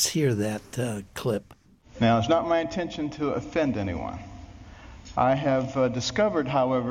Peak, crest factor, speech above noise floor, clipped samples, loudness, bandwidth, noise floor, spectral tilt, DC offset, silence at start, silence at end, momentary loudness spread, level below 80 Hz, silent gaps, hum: -10 dBFS; 16 dB; 20 dB; under 0.1%; -26 LUFS; 16.5 kHz; -45 dBFS; -5 dB/octave; under 0.1%; 0 s; 0 s; 17 LU; -50 dBFS; none; none